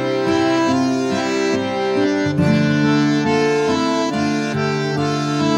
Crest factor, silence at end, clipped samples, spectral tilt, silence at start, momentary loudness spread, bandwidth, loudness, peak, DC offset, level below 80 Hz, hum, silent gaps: 14 dB; 0 s; under 0.1%; -6 dB/octave; 0 s; 4 LU; 11 kHz; -18 LUFS; -4 dBFS; under 0.1%; -54 dBFS; none; none